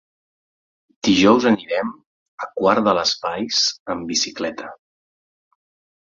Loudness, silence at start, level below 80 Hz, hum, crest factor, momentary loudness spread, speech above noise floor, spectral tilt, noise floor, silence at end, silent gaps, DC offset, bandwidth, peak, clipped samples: -19 LUFS; 1.05 s; -56 dBFS; none; 20 dB; 16 LU; over 71 dB; -3.5 dB/octave; under -90 dBFS; 1.3 s; 2.06-2.38 s, 3.80-3.86 s; under 0.1%; 7.6 kHz; -2 dBFS; under 0.1%